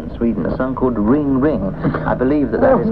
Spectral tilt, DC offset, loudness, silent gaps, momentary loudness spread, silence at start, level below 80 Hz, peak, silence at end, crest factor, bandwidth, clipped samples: -11 dB/octave; 1%; -17 LUFS; none; 6 LU; 0 s; -32 dBFS; -2 dBFS; 0 s; 14 dB; 4.9 kHz; under 0.1%